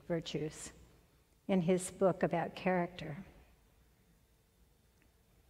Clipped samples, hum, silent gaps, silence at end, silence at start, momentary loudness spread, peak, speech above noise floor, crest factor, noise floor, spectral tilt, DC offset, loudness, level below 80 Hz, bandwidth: under 0.1%; none; none; 2.1 s; 0.1 s; 18 LU; -18 dBFS; 34 dB; 20 dB; -70 dBFS; -6 dB/octave; under 0.1%; -36 LUFS; -66 dBFS; 15 kHz